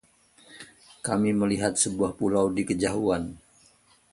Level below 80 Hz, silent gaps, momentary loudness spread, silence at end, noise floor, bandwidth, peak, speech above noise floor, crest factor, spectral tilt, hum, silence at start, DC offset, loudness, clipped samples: -54 dBFS; none; 22 LU; 0.75 s; -60 dBFS; 11.5 kHz; -8 dBFS; 35 dB; 20 dB; -4.5 dB/octave; none; 0.5 s; under 0.1%; -26 LUFS; under 0.1%